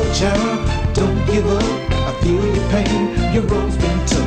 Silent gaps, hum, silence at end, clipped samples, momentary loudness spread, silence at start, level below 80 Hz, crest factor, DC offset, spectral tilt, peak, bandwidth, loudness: none; none; 0 s; under 0.1%; 3 LU; 0 s; -22 dBFS; 12 dB; under 0.1%; -6 dB/octave; -4 dBFS; 9.6 kHz; -18 LUFS